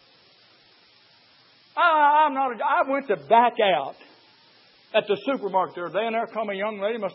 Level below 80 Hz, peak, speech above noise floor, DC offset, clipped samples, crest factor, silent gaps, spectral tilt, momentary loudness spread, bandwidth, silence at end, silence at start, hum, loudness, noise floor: -86 dBFS; -6 dBFS; 34 dB; under 0.1%; under 0.1%; 18 dB; none; -8.5 dB/octave; 10 LU; 5.8 kHz; 0 s; 1.75 s; none; -23 LUFS; -57 dBFS